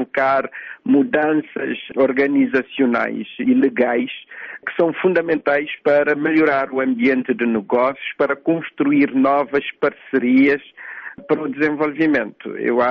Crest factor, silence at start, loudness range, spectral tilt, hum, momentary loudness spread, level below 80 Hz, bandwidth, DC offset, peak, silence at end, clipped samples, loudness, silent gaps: 14 dB; 0 s; 1 LU; -8 dB/octave; none; 9 LU; -62 dBFS; 5.6 kHz; under 0.1%; -6 dBFS; 0 s; under 0.1%; -18 LUFS; none